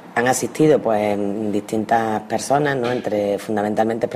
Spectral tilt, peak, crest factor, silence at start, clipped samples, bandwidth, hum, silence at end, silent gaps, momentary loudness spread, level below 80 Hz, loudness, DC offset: -5 dB/octave; -4 dBFS; 16 dB; 0 s; under 0.1%; 15.5 kHz; none; 0 s; none; 6 LU; -58 dBFS; -20 LUFS; under 0.1%